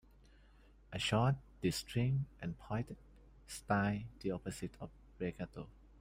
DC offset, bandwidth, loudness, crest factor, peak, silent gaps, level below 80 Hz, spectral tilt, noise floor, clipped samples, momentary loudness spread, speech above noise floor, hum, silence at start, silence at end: under 0.1%; 16 kHz; -39 LUFS; 20 dB; -20 dBFS; none; -60 dBFS; -5.5 dB/octave; -63 dBFS; under 0.1%; 16 LU; 25 dB; none; 0.9 s; 0.3 s